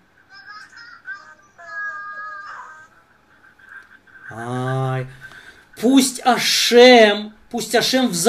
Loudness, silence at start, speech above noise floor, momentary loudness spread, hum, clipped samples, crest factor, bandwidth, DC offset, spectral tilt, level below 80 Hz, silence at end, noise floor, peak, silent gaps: -15 LUFS; 0.45 s; 39 dB; 27 LU; none; under 0.1%; 20 dB; 15.5 kHz; under 0.1%; -3.5 dB/octave; -60 dBFS; 0 s; -54 dBFS; 0 dBFS; none